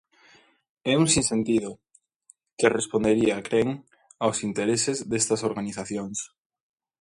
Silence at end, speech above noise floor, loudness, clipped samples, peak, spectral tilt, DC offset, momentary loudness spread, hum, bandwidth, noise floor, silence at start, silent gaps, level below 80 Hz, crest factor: 0.75 s; 36 dB; -25 LUFS; under 0.1%; -4 dBFS; -4 dB/octave; under 0.1%; 12 LU; none; 11.5 kHz; -61 dBFS; 0.85 s; 2.53-2.57 s; -56 dBFS; 24 dB